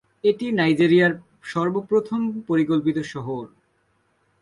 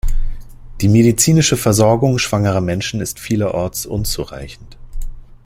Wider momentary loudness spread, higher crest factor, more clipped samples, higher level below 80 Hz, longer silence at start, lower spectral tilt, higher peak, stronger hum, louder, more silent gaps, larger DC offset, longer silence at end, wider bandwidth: second, 14 LU vs 21 LU; about the same, 16 dB vs 16 dB; neither; second, -64 dBFS vs -26 dBFS; first, 0.25 s vs 0.05 s; first, -7 dB/octave vs -5 dB/octave; second, -6 dBFS vs 0 dBFS; neither; second, -22 LUFS vs -15 LUFS; neither; neither; first, 0.95 s vs 0.1 s; second, 11 kHz vs 16.5 kHz